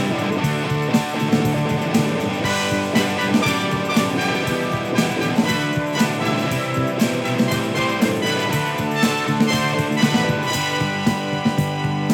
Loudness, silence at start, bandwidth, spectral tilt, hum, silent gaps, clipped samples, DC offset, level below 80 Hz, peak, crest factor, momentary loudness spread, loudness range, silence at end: -20 LUFS; 0 s; 18.5 kHz; -5 dB/octave; none; none; under 0.1%; under 0.1%; -50 dBFS; -4 dBFS; 16 dB; 3 LU; 1 LU; 0 s